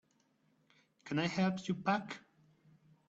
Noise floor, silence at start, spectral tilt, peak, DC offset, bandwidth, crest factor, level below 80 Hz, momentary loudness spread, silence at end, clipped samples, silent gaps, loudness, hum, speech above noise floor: -75 dBFS; 1.05 s; -6 dB/octave; -20 dBFS; under 0.1%; 7.8 kHz; 20 dB; -76 dBFS; 16 LU; 0.9 s; under 0.1%; none; -36 LUFS; none; 39 dB